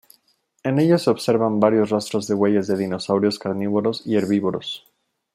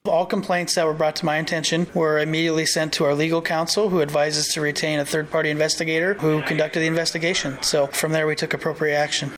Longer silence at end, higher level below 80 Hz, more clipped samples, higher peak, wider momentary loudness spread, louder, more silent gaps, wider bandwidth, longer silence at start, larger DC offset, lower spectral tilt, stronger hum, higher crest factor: first, 0.55 s vs 0 s; second, -66 dBFS vs -56 dBFS; neither; first, -4 dBFS vs -10 dBFS; first, 8 LU vs 2 LU; about the same, -21 LUFS vs -21 LUFS; neither; second, 15 kHz vs 17 kHz; first, 0.65 s vs 0.05 s; neither; first, -6.5 dB/octave vs -3.5 dB/octave; neither; first, 18 dB vs 12 dB